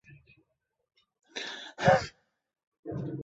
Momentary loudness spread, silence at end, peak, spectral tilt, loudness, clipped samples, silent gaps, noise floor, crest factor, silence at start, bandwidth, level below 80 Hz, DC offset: 18 LU; 0 s; -8 dBFS; -4 dB/octave; -30 LUFS; under 0.1%; 2.67-2.72 s, 2.79-2.83 s; -77 dBFS; 26 dB; 0.1 s; 8 kHz; -58 dBFS; under 0.1%